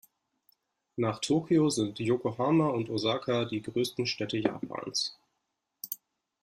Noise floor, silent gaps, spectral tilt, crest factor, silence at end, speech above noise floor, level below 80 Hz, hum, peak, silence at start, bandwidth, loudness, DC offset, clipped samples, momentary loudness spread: -82 dBFS; none; -5 dB/octave; 20 dB; 0.5 s; 53 dB; -68 dBFS; none; -10 dBFS; 0.95 s; 15.5 kHz; -30 LUFS; under 0.1%; under 0.1%; 13 LU